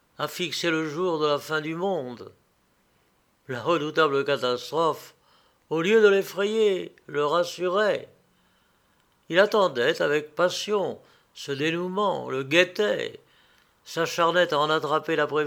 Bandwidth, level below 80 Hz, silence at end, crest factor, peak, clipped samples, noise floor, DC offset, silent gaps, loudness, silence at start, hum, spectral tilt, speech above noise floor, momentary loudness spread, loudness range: 18.5 kHz; -76 dBFS; 0 s; 22 dB; -4 dBFS; under 0.1%; -66 dBFS; under 0.1%; none; -25 LUFS; 0.2 s; none; -4.5 dB/octave; 42 dB; 11 LU; 4 LU